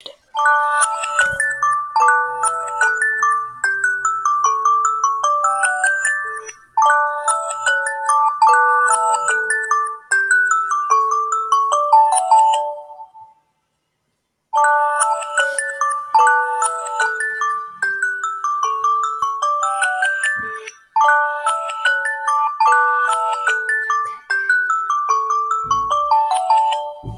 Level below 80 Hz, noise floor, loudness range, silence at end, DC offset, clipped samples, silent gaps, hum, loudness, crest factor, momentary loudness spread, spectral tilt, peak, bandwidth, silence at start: -58 dBFS; -71 dBFS; 4 LU; 0 s; under 0.1%; under 0.1%; none; none; -17 LUFS; 14 dB; 7 LU; 0.5 dB/octave; -4 dBFS; 14 kHz; 0.05 s